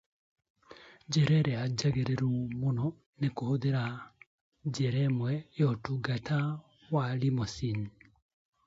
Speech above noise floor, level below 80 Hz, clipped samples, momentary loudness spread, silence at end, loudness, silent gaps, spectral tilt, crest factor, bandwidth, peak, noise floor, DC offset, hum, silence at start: 25 dB; -60 dBFS; under 0.1%; 10 LU; 0.8 s; -32 LUFS; 3.06-3.13 s, 4.27-4.52 s; -6.5 dB/octave; 16 dB; 7.8 kHz; -16 dBFS; -55 dBFS; under 0.1%; none; 0.7 s